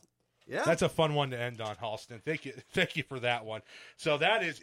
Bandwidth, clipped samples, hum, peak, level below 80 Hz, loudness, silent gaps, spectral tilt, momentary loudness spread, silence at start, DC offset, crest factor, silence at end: 16 kHz; under 0.1%; none; -14 dBFS; -64 dBFS; -32 LUFS; none; -4.5 dB/octave; 12 LU; 0.5 s; under 0.1%; 20 dB; 0.05 s